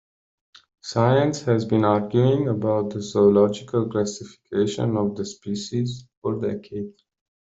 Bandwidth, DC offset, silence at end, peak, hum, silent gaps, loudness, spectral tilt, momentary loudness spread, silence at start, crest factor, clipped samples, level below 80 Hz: 8 kHz; under 0.1%; 0.7 s; -4 dBFS; none; 6.17-6.22 s; -23 LUFS; -7 dB/octave; 13 LU; 0.85 s; 18 dB; under 0.1%; -58 dBFS